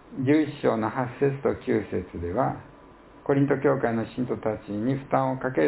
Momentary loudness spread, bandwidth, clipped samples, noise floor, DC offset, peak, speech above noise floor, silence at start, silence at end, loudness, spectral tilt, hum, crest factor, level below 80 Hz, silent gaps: 7 LU; 4 kHz; under 0.1%; -50 dBFS; under 0.1%; -8 dBFS; 25 dB; 0.1 s; 0 s; -26 LUFS; -11.5 dB/octave; none; 18 dB; -52 dBFS; none